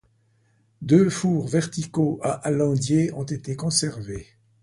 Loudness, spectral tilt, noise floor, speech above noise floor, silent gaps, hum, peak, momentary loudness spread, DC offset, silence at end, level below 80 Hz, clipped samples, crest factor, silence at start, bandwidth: -23 LUFS; -5.5 dB/octave; -64 dBFS; 41 dB; none; none; -4 dBFS; 14 LU; under 0.1%; 0.4 s; -54 dBFS; under 0.1%; 18 dB; 0.8 s; 11.5 kHz